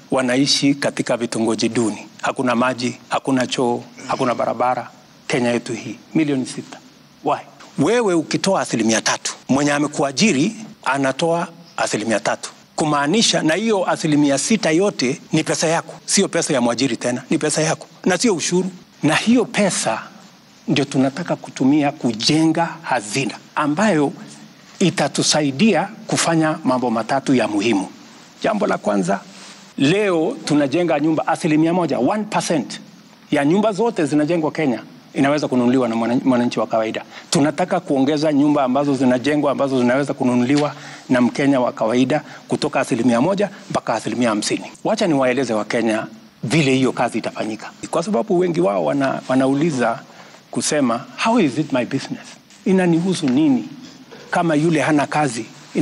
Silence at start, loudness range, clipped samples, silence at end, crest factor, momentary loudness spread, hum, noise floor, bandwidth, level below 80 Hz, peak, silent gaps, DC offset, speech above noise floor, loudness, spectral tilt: 0.1 s; 3 LU; under 0.1%; 0 s; 14 dB; 9 LU; none; -46 dBFS; 12 kHz; -62 dBFS; -4 dBFS; none; under 0.1%; 28 dB; -19 LUFS; -4.5 dB/octave